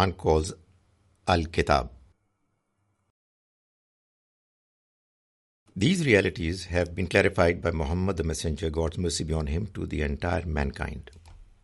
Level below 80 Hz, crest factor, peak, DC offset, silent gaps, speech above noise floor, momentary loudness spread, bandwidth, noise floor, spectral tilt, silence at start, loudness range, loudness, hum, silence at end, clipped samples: -42 dBFS; 22 dB; -6 dBFS; under 0.1%; 3.10-5.66 s; 49 dB; 12 LU; 11.5 kHz; -75 dBFS; -5.5 dB/octave; 0 s; 6 LU; -27 LUFS; none; 0.2 s; under 0.1%